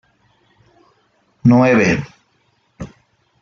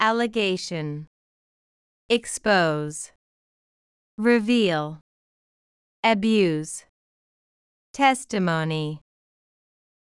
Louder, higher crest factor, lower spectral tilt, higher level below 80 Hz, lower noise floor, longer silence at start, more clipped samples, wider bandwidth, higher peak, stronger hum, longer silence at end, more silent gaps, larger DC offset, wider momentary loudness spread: first, -14 LUFS vs -23 LUFS; about the same, 16 dB vs 20 dB; first, -7 dB/octave vs -4.5 dB/octave; first, -50 dBFS vs -64 dBFS; second, -61 dBFS vs under -90 dBFS; first, 1.45 s vs 0 s; neither; second, 7.2 kHz vs 12 kHz; first, -2 dBFS vs -6 dBFS; neither; second, 0.55 s vs 1.05 s; second, none vs 1.07-2.09 s, 3.16-4.18 s, 5.01-6.03 s, 6.89-7.94 s; neither; first, 24 LU vs 15 LU